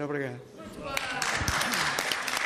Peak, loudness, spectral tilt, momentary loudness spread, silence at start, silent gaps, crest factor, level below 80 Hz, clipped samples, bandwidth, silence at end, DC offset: -12 dBFS; -29 LUFS; -2 dB/octave; 14 LU; 0 s; none; 20 dB; -48 dBFS; under 0.1%; 15.5 kHz; 0 s; under 0.1%